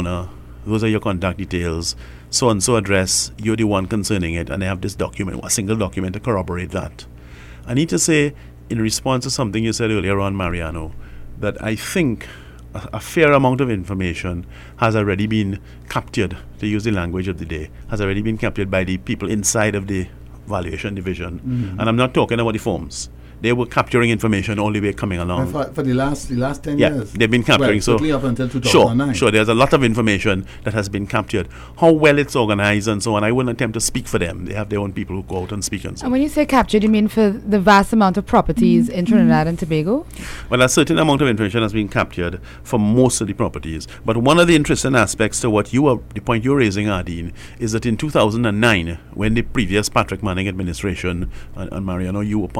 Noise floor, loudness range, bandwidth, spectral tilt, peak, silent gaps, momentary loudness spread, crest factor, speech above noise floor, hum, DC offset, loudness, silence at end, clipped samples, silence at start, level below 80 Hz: -38 dBFS; 6 LU; 16 kHz; -5 dB/octave; -2 dBFS; none; 12 LU; 16 dB; 20 dB; none; under 0.1%; -18 LUFS; 0 s; under 0.1%; 0 s; -36 dBFS